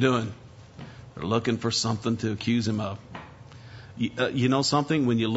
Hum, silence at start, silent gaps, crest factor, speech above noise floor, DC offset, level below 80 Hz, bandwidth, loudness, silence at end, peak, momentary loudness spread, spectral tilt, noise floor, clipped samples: none; 0 s; none; 18 dB; 21 dB; under 0.1%; -58 dBFS; 8 kHz; -26 LUFS; 0 s; -8 dBFS; 22 LU; -5 dB/octave; -46 dBFS; under 0.1%